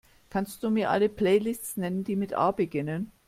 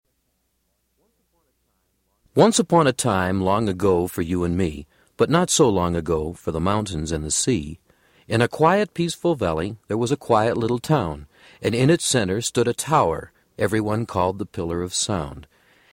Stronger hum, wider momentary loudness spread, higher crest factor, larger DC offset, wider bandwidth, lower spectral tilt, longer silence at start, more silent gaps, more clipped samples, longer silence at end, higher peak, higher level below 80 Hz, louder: neither; about the same, 8 LU vs 10 LU; about the same, 16 dB vs 18 dB; neither; about the same, 16 kHz vs 16.5 kHz; about the same, -6 dB/octave vs -5 dB/octave; second, 0.3 s vs 2.35 s; neither; neither; second, 0.2 s vs 0.5 s; second, -10 dBFS vs -4 dBFS; second, -60 dBFS vs -44 dBFS; second, -28 LUFS vs -21 LUFS